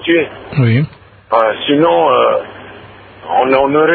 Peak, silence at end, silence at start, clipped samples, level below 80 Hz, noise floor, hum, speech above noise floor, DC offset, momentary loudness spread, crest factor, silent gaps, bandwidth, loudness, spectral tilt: 0 dBFS; 0 s; 0 s; under 0.1%; -48 dBFS; -36 dBFS; none; 24 dB; under 0.1%; 12 LU; 14 dB; none; 4.6 kHz; -13 LUFS; -10 dB/octave